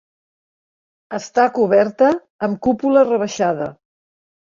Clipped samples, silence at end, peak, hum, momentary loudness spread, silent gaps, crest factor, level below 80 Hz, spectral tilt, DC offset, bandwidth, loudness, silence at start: under 0.1%; 0.7 s; -2 dBFS; none; 12 LU; 2.30-2.39 s; 16 dB; -58 dBFS; -5.5 dB/octave; under 0.1%; 7.4 kHz; -17 LUFS; 1.1 s